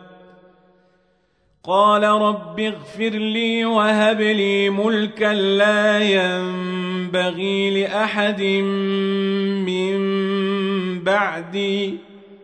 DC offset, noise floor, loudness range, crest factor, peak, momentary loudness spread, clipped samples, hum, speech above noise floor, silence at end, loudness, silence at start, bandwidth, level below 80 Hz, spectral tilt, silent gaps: under 0.1%; -63 dBFS; 3 LU; 16 dB; -4 dBFS; 8 LU; under 0.1%; none; 44 dB; 0.1 s; -19 LUFS; 0 s; 9.2 kHz; -66 dBFS; -5.5 dB/octave; none